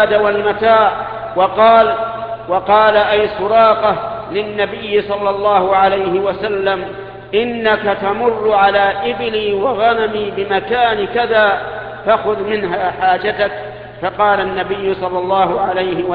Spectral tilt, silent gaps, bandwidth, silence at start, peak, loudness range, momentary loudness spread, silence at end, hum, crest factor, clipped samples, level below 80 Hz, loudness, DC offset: -8 dB/octave; none; 5 kHz; 0 s; 0 dBFS; 4 LU; 10 LU; 0 s; none; 14 dB; under 0.1%; -44 dBFS; -14 LUFS; under 0.1%